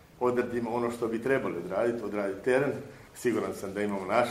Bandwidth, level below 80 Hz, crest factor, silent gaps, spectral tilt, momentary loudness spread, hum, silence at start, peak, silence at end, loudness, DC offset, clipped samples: 15.5 kHz; -62 dBFS; 20 dB; none; -6 dB/octave; 5 LU; none; 0.15 s; -10 dBFS; 0 s; -30 LUFS; under 0.1%; under 0.1%